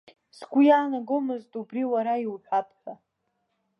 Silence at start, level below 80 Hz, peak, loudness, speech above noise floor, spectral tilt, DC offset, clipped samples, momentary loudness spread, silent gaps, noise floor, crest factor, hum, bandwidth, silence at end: 0.4 s; -86 dBFS; -8 dBFS; -25 LUFS; 51 dB; -6.5 dB/octave; under 0.1%; under 0.1%; 18 LU; none; -76 dBFS; 18 dB; none; 6 kHz; 0.85 s